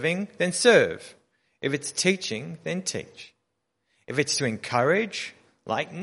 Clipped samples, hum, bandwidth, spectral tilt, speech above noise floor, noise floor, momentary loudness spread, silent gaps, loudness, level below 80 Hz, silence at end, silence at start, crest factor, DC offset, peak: under 0.1%; none; 11.5 kHz; -3.5 dB/octave; 53 dB; -78 dBFS; 15 LU; none; -25 LUFS; -68 dBFS; 0 s; 0 s; 22 dB; under 0.1%; -6 dBFS